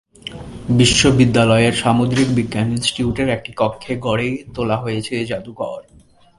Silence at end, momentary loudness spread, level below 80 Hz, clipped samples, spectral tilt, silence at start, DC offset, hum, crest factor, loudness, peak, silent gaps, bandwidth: 0.6 s; 15 LU; -40 dBFS; under 0.1%; -5 dB/octave; 0.25 s; under 0.1%; none; 18 dB; -17 LUFS; 0 dBFS; none; 11.5 kHz